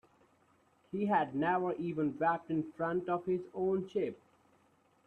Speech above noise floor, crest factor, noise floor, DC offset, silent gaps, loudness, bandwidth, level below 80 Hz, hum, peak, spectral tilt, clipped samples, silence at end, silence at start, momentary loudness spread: 36 dB; 18 dB; -70 dBFS; under 0.1%; none; -35 LUFS; 6.4 kHz; -74 dBFS; none; -18 dBFS; -9 dB/octave; under 0.1%; 0.9 s; 0.95 s; 6 LU